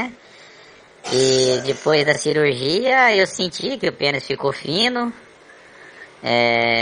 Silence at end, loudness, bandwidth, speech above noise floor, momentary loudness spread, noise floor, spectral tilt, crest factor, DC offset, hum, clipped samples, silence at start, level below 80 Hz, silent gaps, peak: 0 s; -18 LUFS; 11 kHz; 28 dB; 9 LU; -46 dBFS; -3.5 dB/octave; 18 dB; under 0.1%; none; under 0.1%; 0 s; -58 dBFS; none; -2 dBFS